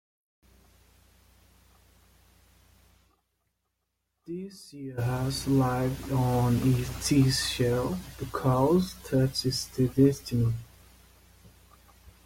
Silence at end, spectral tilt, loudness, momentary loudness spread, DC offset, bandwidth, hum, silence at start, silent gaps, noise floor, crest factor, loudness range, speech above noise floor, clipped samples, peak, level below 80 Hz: 0.15 s; -6 dB/octave; -27 LUFS; 15 LU; under 0.1%; 16.5 kHz; none; 4.3 s; none; -80 dBFS; 20 dB; 12 LU; 54 dB; under 0.1%; -10 dBFS; -50 dBFS